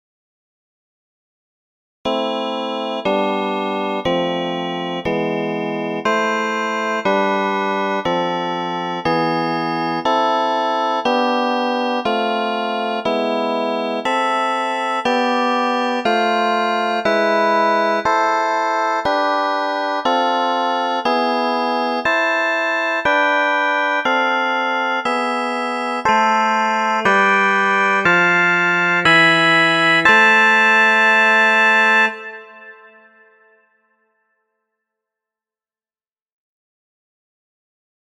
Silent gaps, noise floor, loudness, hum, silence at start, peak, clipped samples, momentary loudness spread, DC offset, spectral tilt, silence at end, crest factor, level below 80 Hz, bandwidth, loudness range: none; under -90 dBFS; -16 LUFS; none; 2.05 s; 0 dBFS; under 0.1%; 10 LU; under 0.1%; -4 dB/octave; 5.3 s; 18 dB; -58 dBFS; 13 kHz; 9 LU